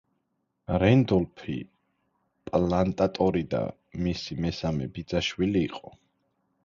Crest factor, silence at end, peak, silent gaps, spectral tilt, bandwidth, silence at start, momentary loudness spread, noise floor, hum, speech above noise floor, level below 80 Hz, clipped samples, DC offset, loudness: 20 dB; 0.8 s; -8 dBFS; none; -7 dB/octave; 7.4 kHz; 0.7 s; 14 LU; -77 dBFS; none; 51 dB; -46 dBFS; under 0.1%; under 0.1%; -27 LUFS